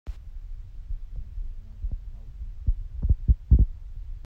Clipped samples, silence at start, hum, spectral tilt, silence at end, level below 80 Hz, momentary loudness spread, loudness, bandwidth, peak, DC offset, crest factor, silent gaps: under 0.1%; 0.05 s; none; -11 dB/octave; 0 s; -28 dBFS; 21 LU; -28 LUFS; 1.1 kHz; -6 dBFS; under 0.1%; 20 dB; none